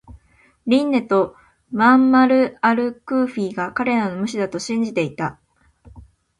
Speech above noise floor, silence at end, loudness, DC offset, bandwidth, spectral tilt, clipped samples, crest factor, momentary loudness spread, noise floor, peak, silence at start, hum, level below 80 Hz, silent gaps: 38 dB; 0.4 s; -19 LUFS; under 0.1%; 11 kHz; -6 dB/octave; under 0.1%; 16 dB; 11 LU; -56 dBFS; -4 dBFS; 0.1 s; none; -54 dBFS; none